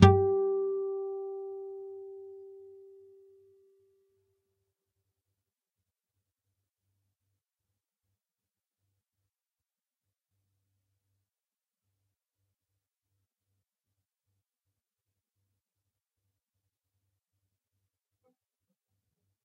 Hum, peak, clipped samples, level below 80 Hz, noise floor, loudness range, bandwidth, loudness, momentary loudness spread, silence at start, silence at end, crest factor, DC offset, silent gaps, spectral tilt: none; -4 dBFS; under 0.1%; -58 dBFS; under -90 dBFS; 23 LU; 5.4 kHz; -30 LUFS; 23 LU; 0 s; 16.85 s; 34 dB; under 0.1%; none; -7 dB/octave